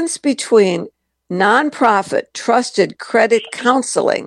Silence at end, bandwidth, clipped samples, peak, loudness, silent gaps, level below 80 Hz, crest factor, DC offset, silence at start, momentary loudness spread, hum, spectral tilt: 0 s; 12 kHz; under 0.1%; 0 dBFS; -15 LUFS; none; -66 dBFS; 16 dB; under 0.1%; 0 s; 7 LU; none; -4 dB/octave